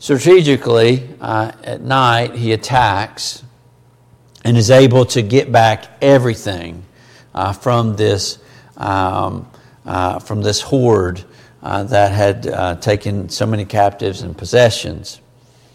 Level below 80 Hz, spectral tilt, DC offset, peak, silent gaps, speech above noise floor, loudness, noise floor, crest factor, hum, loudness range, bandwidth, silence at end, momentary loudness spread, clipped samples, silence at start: -46 dBFS; -5.5 dB/octave; under 0.1%; 0 dBFS; none; 35 dB; -15 LUFS; -49 dBFS; 14 dB; none; 5 LU; 15 kHz; 0.6 s; 14 LU; under 0.1%; 0 s